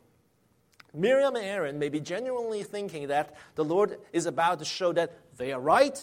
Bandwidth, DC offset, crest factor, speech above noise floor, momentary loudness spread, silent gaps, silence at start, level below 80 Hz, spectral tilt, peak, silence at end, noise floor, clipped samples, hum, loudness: 16 kHz; under 0.1%; 20 dB; 40 dB; 11 LU; none; 0.95 s; -70 dBFS; -4.5 dB/octave; -8 dBFS; 0 s; -68 dBFS; under 0.1%; none; -29 LUFS